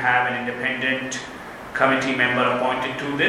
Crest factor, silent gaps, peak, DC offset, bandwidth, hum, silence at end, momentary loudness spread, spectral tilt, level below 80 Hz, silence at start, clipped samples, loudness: 18 dB; none; -4 dBFS; under 0.1%; 14.5 kHz; none; 0 s; 12 LU; -4 dB/octave; -56 dBFS; 0 s; under 0.1%; -22 LUFS